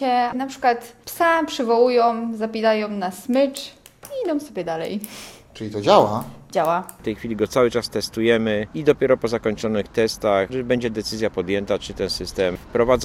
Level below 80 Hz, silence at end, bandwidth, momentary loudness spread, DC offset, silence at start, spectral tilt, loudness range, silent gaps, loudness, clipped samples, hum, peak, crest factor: -48 dBFS; 0 s; 17 kHz; 12 LU; under 0.1%; 0 s; -5 dB/octave; 3 LU; none; -21 LUFS; under 0.1%; none; 0 dBFS; 20 dB